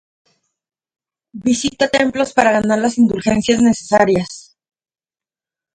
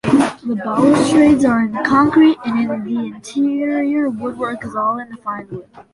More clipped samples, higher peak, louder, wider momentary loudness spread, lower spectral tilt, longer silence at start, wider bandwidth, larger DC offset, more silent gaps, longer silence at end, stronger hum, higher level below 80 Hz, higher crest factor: neither; about the same, 0 dBFS vs -2 dBFS; about the same, -15 LUFS vs -16 LUFS; second, 6 LU vs 14 LU; second, -4.5 dB/octave vs -6 dB/octave; first, 1.35 s vs 0.05 s; second, 9.4 kHz vs 11.5 kHz; neither; neither; first, 1.35 s vs 0.1 s; neither; about the same, -48 dBFS vs -50 dBFS; about the same, 18 dB vs 14 dB